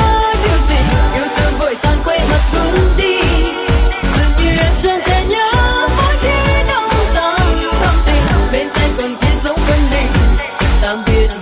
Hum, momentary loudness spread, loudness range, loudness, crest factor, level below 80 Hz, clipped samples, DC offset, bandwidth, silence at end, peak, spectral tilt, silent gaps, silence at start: none; 3 LU; 1 LU; -13 LUFS; 10 dB; -14 dBFS; under 0.1%; under 0.1%; 5 kHz; 0 s; -2 dBFS; -12 dB/octave; none; 0 s